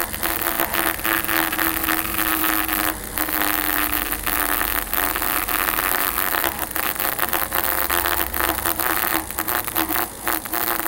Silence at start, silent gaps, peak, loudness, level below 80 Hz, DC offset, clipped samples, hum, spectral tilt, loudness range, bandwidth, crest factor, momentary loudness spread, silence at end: 0 s; none; 0 dBFS; -20 LUFS; -40 dBFS; under 0.1%; under 0.1%; none; -2 dB/octave; 1 LU; 18 kHz; 22 dB; 3 LU; 0 s